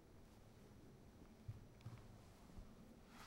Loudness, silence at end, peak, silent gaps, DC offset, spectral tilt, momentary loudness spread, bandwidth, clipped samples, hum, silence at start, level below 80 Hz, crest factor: -62 LUFS; 0 s; -40 dBFS; none; under 0.1%; -6 dB/octave; 7 LU; 16 kHz; under 0.1%; none; 0 s; -66 dBFS; 20 dB